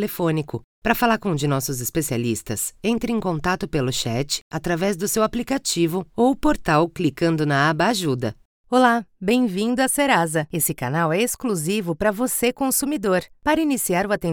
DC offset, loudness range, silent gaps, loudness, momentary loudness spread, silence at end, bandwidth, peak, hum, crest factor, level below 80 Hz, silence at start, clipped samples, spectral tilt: under 0.1%; 3 LU; 0.64-0.82 s, 4.41-4.51 s, 8.45-8.64 s; -21 LUFS; 6 LU; 0 s; 20 kHz; -2 dBFS; none; 18 dB; -44 dBFS; 0 s; under 0.1%; -4.5 dB/octave